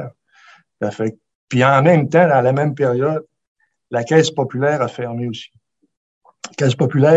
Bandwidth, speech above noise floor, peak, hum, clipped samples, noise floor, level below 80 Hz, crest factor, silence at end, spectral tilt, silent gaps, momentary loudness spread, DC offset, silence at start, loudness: 8.2 kHz; 34 dB; 0 dBFS; none; under 0.1%; -49 dBFS; -62 dBFS; 18 dB; 0 s; -6.5 dB/octave; 1.35-1.48 s, 3.48-3.55 s, 5.97-6.21 s; 13 LU; under 0.1%; 0 s; -17 LUFS